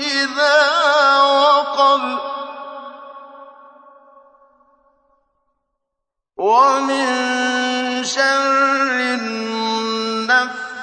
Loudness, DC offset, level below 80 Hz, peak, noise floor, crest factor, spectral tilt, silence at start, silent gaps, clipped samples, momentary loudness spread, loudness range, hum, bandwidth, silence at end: -16 LUFS; under 0.1%; -72 dBFS; -2 dBFS; -80 dBFS; 16 dB; -1.5 dB/octave; 0 s; none; under 0.1%; 15 LU; 11 LU; none; 9.6 kHz; 0 s